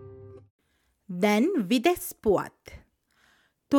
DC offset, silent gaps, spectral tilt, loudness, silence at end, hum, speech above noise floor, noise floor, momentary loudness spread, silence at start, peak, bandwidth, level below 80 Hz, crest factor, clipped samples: under 0.1%; 0.50-0.59 s; -5 dB/octave; -25 LUFS; 0 s; none; 45 dB; -70 dBFS; 18 LU; 0 s; -10 dBFS; 18 kHz; -58 dBFS; 18 dB; under 0.1%